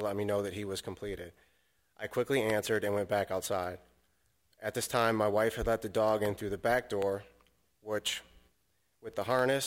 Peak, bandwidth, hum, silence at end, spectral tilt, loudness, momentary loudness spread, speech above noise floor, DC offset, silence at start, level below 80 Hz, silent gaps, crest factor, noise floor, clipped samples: -14 dBFS; 16.5 kHz; none; 0 s; -4 dB/octave; -33 LUFS; 12 LU; 44 dB; under 0.1%; 0 s; -56 dBFS; none; 20 dB; -77 dBFS; under 0.1%